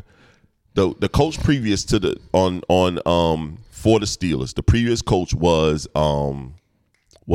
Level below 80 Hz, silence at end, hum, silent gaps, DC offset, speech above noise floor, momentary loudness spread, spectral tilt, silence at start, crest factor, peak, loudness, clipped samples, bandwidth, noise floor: -34 dBFS; 0 s; none; none; under 0.1%; 46 dB; 6 LU; -6 dB/octave; 0.75 s; 16 dB; -4 dBFS; -20 LUFS; under 0.1%; 14.5 kHz; -65 dBFS